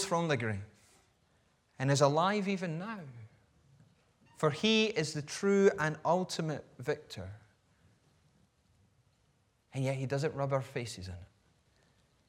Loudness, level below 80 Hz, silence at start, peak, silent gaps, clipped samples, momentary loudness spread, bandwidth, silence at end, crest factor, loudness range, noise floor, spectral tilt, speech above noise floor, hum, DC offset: -32 LUFS; -72 dBFS; 0 s; -12 dBFS; none; under 0.1%; 18 LU; 15 kHz; 1.05 s; 22 dB; 11 LU; -72 dBFS; -5 dB/octave; 40 dB; none; under 0.1%